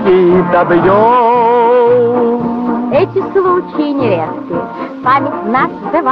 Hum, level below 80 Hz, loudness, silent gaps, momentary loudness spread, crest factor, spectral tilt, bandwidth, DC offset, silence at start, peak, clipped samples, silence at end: none; -46 dBFS; -11 LUFS; none; 8 LU; 8 dB; -9.5 dB/octave; 5.4 kHz; under 0.1%; 0 s; -2 dBFS; under 0.1%; 0 s